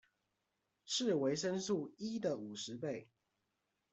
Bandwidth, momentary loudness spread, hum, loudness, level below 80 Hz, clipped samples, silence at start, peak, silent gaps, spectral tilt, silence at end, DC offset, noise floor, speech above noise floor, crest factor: 8.2 kHz; 9 LU; none; -39 LUFS; -82 dBFS; under 0.1%; 0.85 s; -24 dBFS; none; -4 dB/octave; 0.9 s; under 0.1%; -86 dBFS; 47 dB; 16 dB